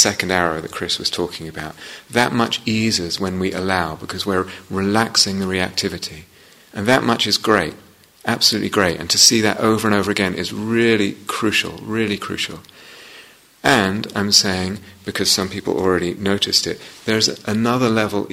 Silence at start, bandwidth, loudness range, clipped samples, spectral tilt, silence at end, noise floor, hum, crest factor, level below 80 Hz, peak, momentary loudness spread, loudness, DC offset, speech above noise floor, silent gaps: 0 s; 16 kHz; 5 LU; under 0.1%; -3 dB/octave; 0 s; -45 dBFS; none; 20 dB; -52 dBFS; 0 dBFS; 12 LU; -18 LUFS; under 0.1%; 26 dB; none